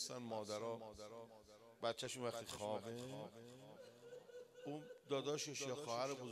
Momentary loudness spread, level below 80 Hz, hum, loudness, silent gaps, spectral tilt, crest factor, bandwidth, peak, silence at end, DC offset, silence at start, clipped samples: 15 LU; -82 dBFS; none; -47 LUFS; none; -3.5 dB/octave; 20 dB; 14 kHz; -28 dBFS; 0 s; under 0.1%; 0 s; under 0.1%